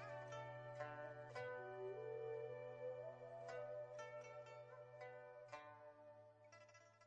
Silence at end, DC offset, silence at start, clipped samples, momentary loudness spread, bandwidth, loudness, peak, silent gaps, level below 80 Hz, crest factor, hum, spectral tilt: 0 s; under 0.1%; 0 s; under 0.1%; 13 LU; 8.4 kHz; -54 LUFS; -38 dBFS; none; -88 dBFS; 16 dB; none; -5.5 dB/octave